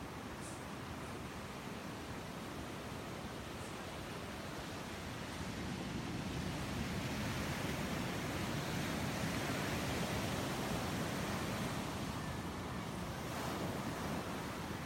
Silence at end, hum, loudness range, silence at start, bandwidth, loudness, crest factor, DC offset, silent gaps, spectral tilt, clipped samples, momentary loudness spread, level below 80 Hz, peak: 0 s; none; 7 LU; 0 s; 16.5 kHz; -42 LUFS; 16 dB; under 0.1%; none; -4.5 dB/octave; under 0.1%; 7 LU; -56 dBFS; -26 dBFS